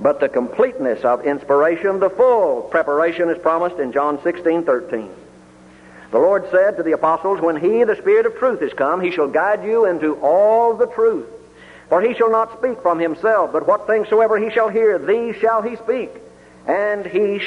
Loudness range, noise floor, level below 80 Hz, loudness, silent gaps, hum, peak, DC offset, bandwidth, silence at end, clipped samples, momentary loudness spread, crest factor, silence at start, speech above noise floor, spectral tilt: 3 LU; -44 dBFS; -58 dBFS; -17 LUFS; none; none; -4 dBFS; under 0.1%; 9.4 kHz; 0 s; under 0.1%; 5 LU; 14 dB; 0 s; 28 dB; -6.5 dB/octave